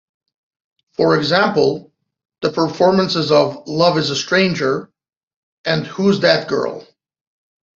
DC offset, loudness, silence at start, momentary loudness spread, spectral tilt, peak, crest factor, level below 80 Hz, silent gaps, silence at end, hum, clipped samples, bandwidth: under 0.1%; -16 LUFS; 1 s; 10 LU; -5 dB/octave; -2 dBFS; 16 dB; -58 dBFS; 5.17-5.64 s; 0.9 s; none; under 0.1%; 7.8 kHz